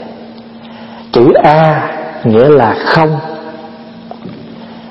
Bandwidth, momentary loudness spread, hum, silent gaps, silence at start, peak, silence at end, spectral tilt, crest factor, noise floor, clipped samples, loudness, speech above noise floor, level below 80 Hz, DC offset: 6 kHz; 24 LU; none; none; 0 s; 0 dBFS; 0 s; -8.5 dB/octave; 12 dB; -30 dBFS; 0.4%; -9 LUFS; 23 dB; -46 dBFS; under 0.1%